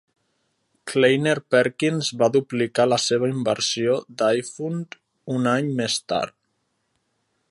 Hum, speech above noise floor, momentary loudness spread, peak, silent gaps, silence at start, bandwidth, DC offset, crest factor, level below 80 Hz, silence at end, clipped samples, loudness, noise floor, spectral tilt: none; 51 dB; 10 LU; -4 dBFS; none; 0.85 s; 11.5 kHz; under 0.1%; 18 dB; -66 dBFS; 1.2 s; under 0.1%; -22 LUFS; -73 dBFS; -4.5 dB/octave